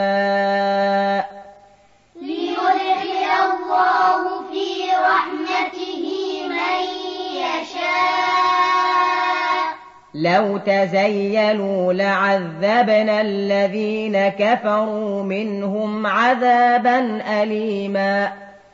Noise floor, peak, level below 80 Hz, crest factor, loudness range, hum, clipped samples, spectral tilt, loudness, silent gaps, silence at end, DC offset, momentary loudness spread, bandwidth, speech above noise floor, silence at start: -52 dBFS; -4 dBFS; -66 dBFS; 16 dB; 3 LU; none; under 0.1%; -5.5 dB/octave; -19 LUFS; none; 0.15 s; under 0.1%; 9 LU; 7.6 kHz; 34 dB; 0 s